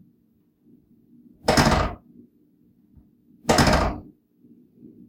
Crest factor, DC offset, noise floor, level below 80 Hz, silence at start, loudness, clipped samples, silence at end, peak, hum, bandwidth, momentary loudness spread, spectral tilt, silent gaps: 22 dB; under 0.1%; -63 dBFS; -36 dBFS; 1.45 s; -21 LUFS; under 0.1%; 1.05 s; -4 dBFS; none; 16.5 kHz; 16 LU; -4.5 dB/octave; none